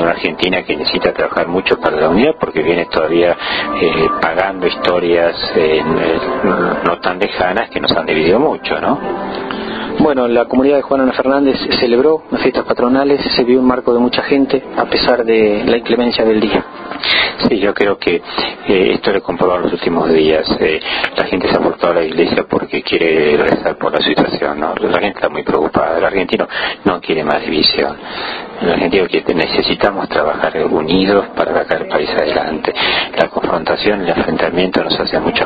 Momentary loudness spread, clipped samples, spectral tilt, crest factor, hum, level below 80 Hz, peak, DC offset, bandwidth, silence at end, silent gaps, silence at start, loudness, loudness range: 5 LU; under 0.1%; -7.5 dB/octave; 14 dB; none; -42 dBFS; 0 dBFS; under 0.1%; 5.2 kHz; 0 s; none; 0 s; -14 LUFS; 2 LU